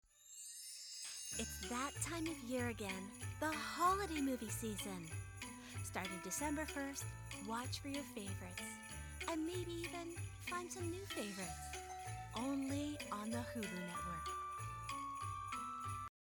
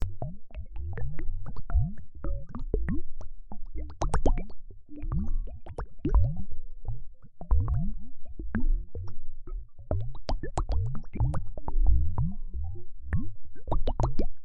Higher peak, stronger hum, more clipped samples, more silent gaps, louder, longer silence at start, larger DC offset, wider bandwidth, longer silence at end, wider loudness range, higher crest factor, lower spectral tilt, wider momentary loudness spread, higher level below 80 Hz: second, -26 dBFS vs -8 dBFS; neither; neither; neither; second, -44 LUFS vs -34 LUFS; first, 0.15 s vs 0 s; neither; first, over 20 kHz vs 8.2 kHz; first, 0.3 s vs 0 s; about the same, 4 LU vs 3 LU; about the same, 20 dB vs 18 dB; second, -4 dB/octave vs -8 dB/octave; second, 8 LU vs 17 LU; second, -60 dBFS vs -30 dBFS